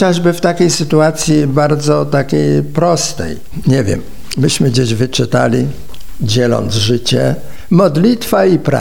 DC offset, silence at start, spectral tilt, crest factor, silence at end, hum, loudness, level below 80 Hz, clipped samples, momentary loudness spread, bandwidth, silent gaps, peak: 5%; 0 s; -5.5 dB/octave; 12 dB; 0 s; none; -13 LUFS; -38 dBFS; under 0.1%; 8 LU; 17.5 kHz; none; 0 dBFS